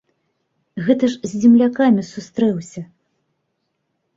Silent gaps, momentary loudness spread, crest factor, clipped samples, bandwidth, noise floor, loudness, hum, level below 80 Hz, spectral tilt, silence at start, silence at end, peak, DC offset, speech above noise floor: none; 19 LU; 16 dB; under 0.1%; 7.8 kHz; -72 dBFS; -17 LUFS; none; -62 dBFS; -6.5 dB/octave; 0.75 s; 1.3 s; -2 dBFS; under 0.1%; 56 dB